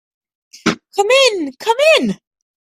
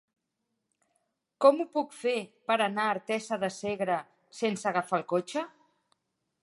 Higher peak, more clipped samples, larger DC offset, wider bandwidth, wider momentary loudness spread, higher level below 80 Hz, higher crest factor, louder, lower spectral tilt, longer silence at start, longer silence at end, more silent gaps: first, 0 dBFS vs -8 dBFS; neither; neither; first, 15 kHz vs 11.5 kHz; about the same, 10 LU vs 10 LU; first, -58 dBFS vs -78 dBFS; second, 16 dB vs 22 dB; first, -14 LUFS vs -30 LUFS; second, -3 dB/octave vs -4.5 dB/octave; second, 0.65 s vs 1.4 s; second, 0.65 s vs 0.95 s; neither